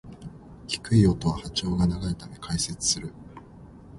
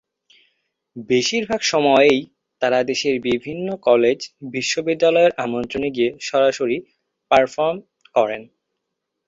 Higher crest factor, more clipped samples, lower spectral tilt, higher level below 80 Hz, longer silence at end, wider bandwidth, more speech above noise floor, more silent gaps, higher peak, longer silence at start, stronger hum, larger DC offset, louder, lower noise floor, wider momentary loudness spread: about the same, 20 dB vs 18 dB; neither; about the same, -5 dB/octave vs -4 dB/octave; first, -42 dBFS vs -58 dBFS; second, 0 s vs 0.85 s; first, 11.5 kHz vs 7.8 kHz; second, 22 dB vs 60 dB; neither; second, -6 dBFS vs -2 dBFS; second, 0.05 s vs 0.95 s; neither; neither; second, -26 LUFS vs -19 LUFS; second, -47 dBFS vs -79 dBFS; first, 23 LU vs 9 LU